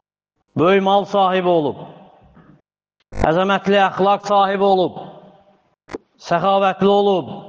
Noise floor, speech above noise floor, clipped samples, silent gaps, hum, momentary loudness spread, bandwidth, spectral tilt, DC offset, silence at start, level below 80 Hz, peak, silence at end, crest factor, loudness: -73 dBFS; 57 dB; under 0.1%; none; none; 20 LU; 7.4 kHz; -6.5 dB/octave; under 0.1%; 0.55 s; -44 dBFS; -4 dBFS; 0 s; 14 dB; -16 LUFS